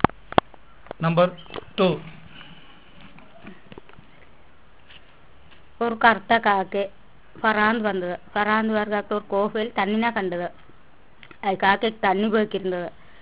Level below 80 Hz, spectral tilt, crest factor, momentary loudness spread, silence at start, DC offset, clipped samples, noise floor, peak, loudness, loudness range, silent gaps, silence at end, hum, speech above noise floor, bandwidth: -52 dBFS; -9.5 dB/octave; 24 dB; 14 LU; 0.05 s; 0.6%; under 0.1%; -54 dBFS; 0 dBFS; -23 LUFS; 6 LU; none; 0.3 s; none; 32 dB; 4 kHz